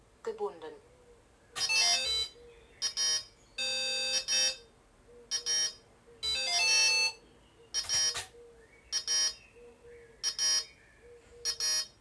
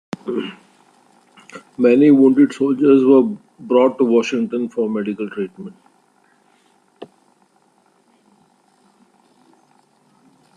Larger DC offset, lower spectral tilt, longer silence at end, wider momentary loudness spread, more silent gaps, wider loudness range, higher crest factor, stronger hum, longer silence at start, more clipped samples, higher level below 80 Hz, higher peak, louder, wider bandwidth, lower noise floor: neither; second, 1.5 dB/octave vs -7 dB/octave; second, 0.15 s vs 3.5 s; second, 15 LU vs 19 LU; neither; second, 4 LU vs 15 LU; about the same, 18 dB vs 16 dB; neither; about the same, 0.25 s vs 0.25 s; neither; about the same, -64 dBFS vs -68 dBFS; second, -16 dBFS vs -2 dBFS; second, -29 LUFS vs -16 LUFS; first, 11 kHz vs 9.6 kHz; about the same, -60 dBFS vs -58 dBFS